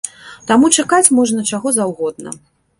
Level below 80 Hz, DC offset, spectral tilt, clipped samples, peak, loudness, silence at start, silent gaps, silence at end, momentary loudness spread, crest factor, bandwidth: -58 dBFS; under 0.1%; -2.5 dB/octave; under 0.1%; 0 dBFS; -13 LUFS; 0.05 s; none; 0.45 s; 20 LU; 16 dB; 14.5 kHz